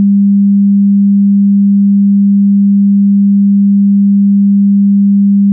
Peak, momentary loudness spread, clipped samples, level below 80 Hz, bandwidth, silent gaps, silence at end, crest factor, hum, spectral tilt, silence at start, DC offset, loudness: -4 dBFS; 0 LU; under 0.1%; -74 dBFS; 0.3 kHz; none; 0 s; 4 dB; none; -20 dB/octave; 0 s; under 0.1%; -8 LUFS